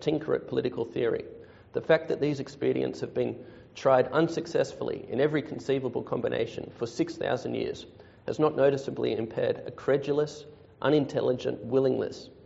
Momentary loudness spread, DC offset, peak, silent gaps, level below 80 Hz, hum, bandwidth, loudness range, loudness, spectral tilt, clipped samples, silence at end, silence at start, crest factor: 11 LU; under 0.1%; -10 dBFS; none; -64 dBFS; none; 8 kHz; 3 LU; -29 LUFS; -5.5 dB/octave; under 0.1%; 0.15 s; 0 s; 18 dB